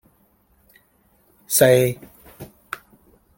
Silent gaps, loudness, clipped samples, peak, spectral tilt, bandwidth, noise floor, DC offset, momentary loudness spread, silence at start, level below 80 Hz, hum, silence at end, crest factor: none; -17 LUFS; under 0.1%; -2 dBFS; -4 dB/octave; 17 kHz; -60 dBFS; under 0.1%; 28 LU; 1.5 s; -58 dBFS; none; 0.95 s; 22 dB